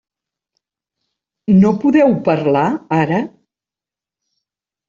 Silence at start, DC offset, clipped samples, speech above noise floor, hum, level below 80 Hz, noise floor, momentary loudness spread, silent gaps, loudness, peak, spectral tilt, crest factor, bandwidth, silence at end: 1.5 s; under 0.1%; under 0.1%; 76 dB; none; -54 dBFS; -89 dBFS; 8 LU; none; -14 LUFS; -2 dBFS; -9 dB/octave; 14 dB; 7.2 kHz; 1.6 s